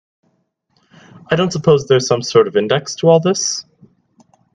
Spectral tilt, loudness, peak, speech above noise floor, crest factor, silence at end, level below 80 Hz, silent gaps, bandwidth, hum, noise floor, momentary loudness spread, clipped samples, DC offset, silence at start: -4.5 dB/octave; -15 LUFS; 0 dBFS; 50 dB; 16 dB; 0.95 s; -56 dBFS; none; 9.6 kHz; none; -64 dBFS; 7 LU; under 0.1%; under 0.1%; 1.3 s